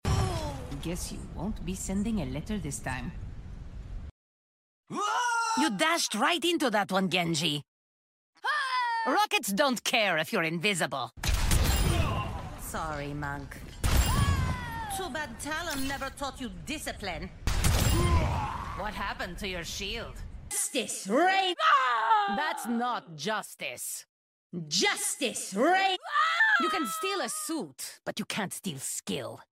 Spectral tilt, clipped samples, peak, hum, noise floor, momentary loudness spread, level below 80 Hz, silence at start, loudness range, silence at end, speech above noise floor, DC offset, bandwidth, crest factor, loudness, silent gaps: -3.5 dB/octave; under 0.1%; -10 dBFS; none; under -90 dBFS; 12 LU; -38 dBFS; 0.05 s; 7 LU; 0.15 s; over 60 dB; under 0.1%; 16 kHz; 20 dB; -29 LUFS; 4.11-4.83 s, 7.68-8.33 s, 24.09-24.50 s